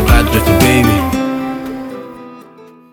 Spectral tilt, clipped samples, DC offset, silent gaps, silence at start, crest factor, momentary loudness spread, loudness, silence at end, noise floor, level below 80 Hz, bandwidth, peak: -5.5 dB/octave; under 0.1%; under 0.1%; none; 0 s; 14 dB; 19 LU; -13 LUFS; 0.3 s; -39 dBFS; -20 dBFS; over 20 kHz; 0 dBFS